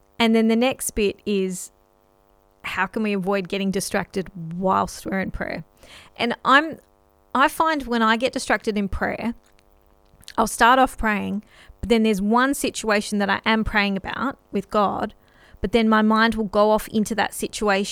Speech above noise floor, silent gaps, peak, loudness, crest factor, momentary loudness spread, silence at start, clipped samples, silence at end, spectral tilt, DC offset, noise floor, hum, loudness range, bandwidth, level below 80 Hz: 38 dB; none; -2 dBFS; -21 LUFS; 20 dB; 13 LU; 0.2 s; under 0.1%; 0 s; -4.5 dB/octave; under 0.1%; -59 dBFS; none; 5 LU; 16 kHz; -42 dBFS